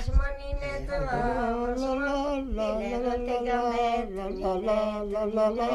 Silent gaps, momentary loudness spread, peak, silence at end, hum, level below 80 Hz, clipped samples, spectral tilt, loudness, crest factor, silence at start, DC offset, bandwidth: none; 6 LU; -12 dBFS; 0 s; none; -36 dBFS; under 0.1%; -6.5 dB/octave; -29 LUFS; 16 dB; 0 s; under 0.1%; 11.5 kHz